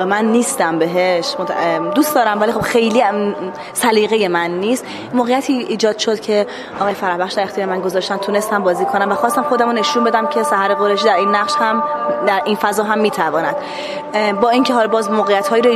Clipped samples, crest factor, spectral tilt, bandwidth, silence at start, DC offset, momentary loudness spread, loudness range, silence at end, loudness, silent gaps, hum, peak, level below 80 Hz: under 0.1%; 16 dB; -4 dB/octave; 15 kHz; 0 s; under 0.1%; 6 LU; 3 LU; 0 s; -16 LUFS; none; none; 0 dBFS; -58 dBFS